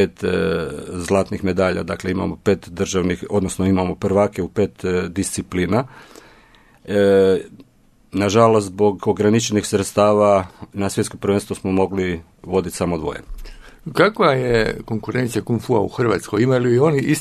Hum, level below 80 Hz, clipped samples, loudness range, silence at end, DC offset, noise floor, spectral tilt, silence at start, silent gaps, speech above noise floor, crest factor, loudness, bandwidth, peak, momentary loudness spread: none; -44 dBFS; under 0.1%; 4 LU; 0 s; under 0.1%; -53 dBFS; -6 dB/octave; 0 s; none; 35 dB; 18 dB; -19 LUFS; 13.5 kHz; 0 dBFS; 9 LU